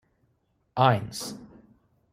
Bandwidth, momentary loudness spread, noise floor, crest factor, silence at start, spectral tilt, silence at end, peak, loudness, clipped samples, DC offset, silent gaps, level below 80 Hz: 15.5 kHz; 16 LU; -71 dBFS; 24 dB; 0.75 s; -5.5 dB/octave; 0.65 s; -6 dBFS; -26 LUFS; under 0.1%; under 0.1%; none; -62 dBFS